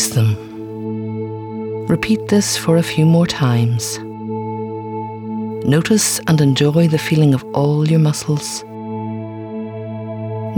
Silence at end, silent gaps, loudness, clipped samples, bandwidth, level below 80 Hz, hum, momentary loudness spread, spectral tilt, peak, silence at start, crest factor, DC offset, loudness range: 0 s; none; -17 LUFS; under 0.1%; over 20 kHz; -52 dBFS; none; 13 LU; -5.5 dB/octave; -2 dBFS; 0 s; 14 dB; under 0.1%; 3 LU